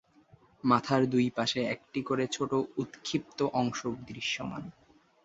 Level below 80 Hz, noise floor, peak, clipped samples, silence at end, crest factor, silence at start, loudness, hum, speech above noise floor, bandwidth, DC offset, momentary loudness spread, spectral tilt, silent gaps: -66 dBFS; -61 dBFS; -10 dBFS; under 0.1%; 0.55 s; 22 dB; 0.65 s; -31 LUFS; none; 31 dB; 8 kHz; under 0.1%; 10 LU; -5 dB/octave; none